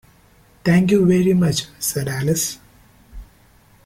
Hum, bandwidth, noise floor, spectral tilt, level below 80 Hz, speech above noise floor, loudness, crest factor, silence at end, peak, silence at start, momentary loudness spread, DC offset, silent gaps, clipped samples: none; 16 kHz; -52 dBFS; -5.5 dB/octave; -46 dBFS; 35 dB; -18 LUFS; 16 dB; 0.65 s; -4 dBFS; 0.65 s; 10 LU; under 0.1%; none; under 0.1%